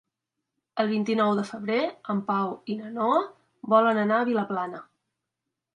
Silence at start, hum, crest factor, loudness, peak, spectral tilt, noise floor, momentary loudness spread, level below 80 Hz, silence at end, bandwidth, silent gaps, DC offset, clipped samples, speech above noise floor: 0.75 s; none; 18 dB; -26 LUFS; -8 dBFS; -7 dB/octave; -85 dBFS; 13 LU; -76 dBFS; 0.95 s; 10 kHz; none; under 0.1%; under 0.1%; 60 dB